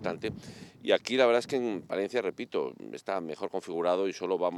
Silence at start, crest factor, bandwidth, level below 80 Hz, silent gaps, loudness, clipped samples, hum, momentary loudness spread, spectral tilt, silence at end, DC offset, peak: 0 s; 22 dB; 12.5 kHz; -72 dBFS; none; -30 LUFS; under 0.1%; none; 13 LU; -4.5 dB/octave; 0 s; under 0.1%; -10 dBFS